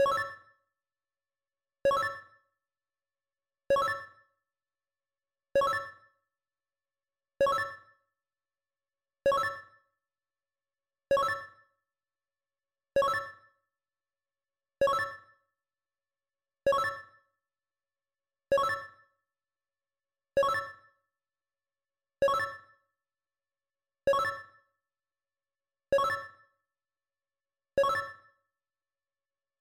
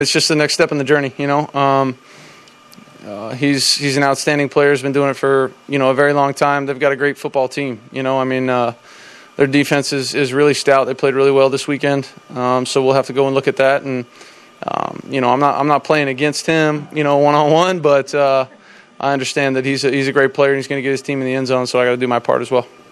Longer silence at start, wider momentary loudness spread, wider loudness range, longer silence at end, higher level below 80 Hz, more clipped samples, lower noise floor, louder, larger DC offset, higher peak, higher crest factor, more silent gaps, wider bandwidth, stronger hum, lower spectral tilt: about the same, 0 s vs 0 s; first, 17 LU vs 9 LU; about the same, 3 LU vs 3 LU; first, 1.5 s vs 0.25 s; about the same, -66 dBFS vs -64 dBFS; neither; first, under -90 dBFS vs -43 dBFS; second, -31 LUFS vs -15 LUFS; neither; second, -20 dBFS vs 0 dBFS; about the same, 16 dB vs 16 dB; neither; first, 16.5 kHz vs 13.5 kHz; neither; about the same, -3.5 dB/octave vs -4.5 dB/octave